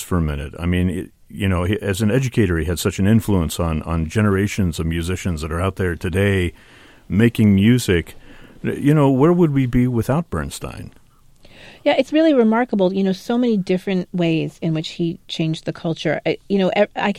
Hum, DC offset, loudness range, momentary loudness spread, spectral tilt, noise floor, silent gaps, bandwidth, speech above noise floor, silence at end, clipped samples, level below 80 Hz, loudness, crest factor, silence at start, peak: none; under 0.1%; 4 LU; 10 LU; -6.5 dB/octave; -48 dBFS; none; 16 kHz; 30 dB; 0 s; under 0.1%; -36 dBFS; -19 LUFS; 18 dB; 0 s; -2 dBFS